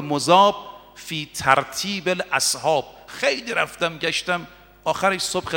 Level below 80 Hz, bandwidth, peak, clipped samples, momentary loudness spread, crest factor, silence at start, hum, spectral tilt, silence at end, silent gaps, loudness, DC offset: -56 dBFS; 17 kHz; 0 dBFS; under 0.1%; 13 LU; 22 dB; 0 s; none; -2.5 dB/octave; 0 s; none; -21 LUFS; under 0.1%